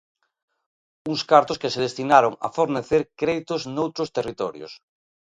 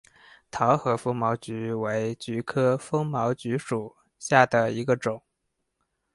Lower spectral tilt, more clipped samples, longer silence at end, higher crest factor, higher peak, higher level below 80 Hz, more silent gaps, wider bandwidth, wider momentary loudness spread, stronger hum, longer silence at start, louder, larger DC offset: about the same, -5 dB/octave vs -6 dB/octave; neither; second, 0.65 s vs 0.95 s; about the same, 22 dB vs 24 dB; about the same, 0 dBFS vs -2 dBFS; about the same, -60 dBFS vs -64 dBFS; neither; second, 9.4 kHz vs 11.5 kHz; about the same, 13 LU vs 11 LU; neither; first, 1.05 s vs 0.55 s; first, -22 LUFS vs -26 LUFS; neither